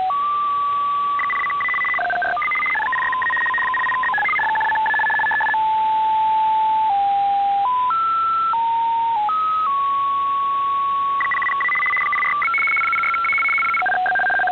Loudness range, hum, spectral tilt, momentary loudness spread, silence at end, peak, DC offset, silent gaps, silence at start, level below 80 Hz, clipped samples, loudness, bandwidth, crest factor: 2 LU; none; -3.5 dB/octave; 3 LU; 0 s; -12 dBFS; under 0.1%; none; 0 s; -58 dBFS; under 0.1%; -18 LUFS; 6.6 kHz; 6 dB